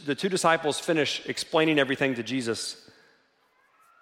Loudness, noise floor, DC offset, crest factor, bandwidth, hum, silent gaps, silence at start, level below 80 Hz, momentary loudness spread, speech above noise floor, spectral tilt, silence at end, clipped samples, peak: -26 LUFS; -66 dBFS; under 0.1%; 20 dB; 16 kHz; none; none; 0 s; -72 dBFS; 8 LU; 40 dB; -3.5 dB/octave; 1.25 s; under 0.1%; -8 dBFS